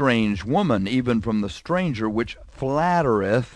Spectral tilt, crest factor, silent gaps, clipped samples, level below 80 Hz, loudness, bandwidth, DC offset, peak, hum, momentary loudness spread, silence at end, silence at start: -7 dB/octave; 16 dB; none; under 0.1%; -46 dBFS; -23 LUFS; 10.5 kHz; under 0.1%; -6 dBFS; none; 6 LU; 0.05 s; 0 s